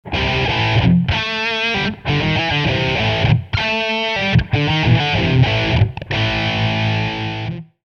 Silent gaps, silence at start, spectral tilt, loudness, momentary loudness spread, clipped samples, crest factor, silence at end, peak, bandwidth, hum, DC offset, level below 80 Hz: none; 0.05 s; -6 dB/octave; -17 LUFS; 5 LU; under 0.1%; 16 dB; 0.25 s; -2 dBFS; 6.8 kHz; none; under 0.1%; -32 dBFS